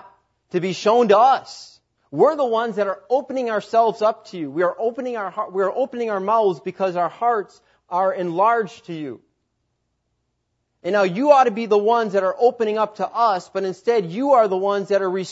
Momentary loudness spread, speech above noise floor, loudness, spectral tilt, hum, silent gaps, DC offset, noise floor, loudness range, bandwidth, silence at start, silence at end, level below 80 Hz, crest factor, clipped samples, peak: 12 LU; 54 dB; -20 LUFS; -5.5 dB/octave; none; none; under 0.1%; -73 dBFS; 5 LU; 8 kHz; 0.55 s; 0 s; -74 dBFS; 20 dB; under 0.1%; -2 dBFS